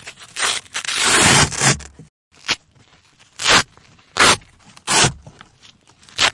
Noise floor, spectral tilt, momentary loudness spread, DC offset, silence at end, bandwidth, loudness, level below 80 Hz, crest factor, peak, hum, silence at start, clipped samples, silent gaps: -53 dBFS; -1.5 dB/octave; 17 LU; under 0.1%; 0 s; 11.5 kHz; -15 LUFS; -44 dBFS; 20 dB; 0 dBFS; none; 0.05 s; under 0.1%; 2.09-2.31 s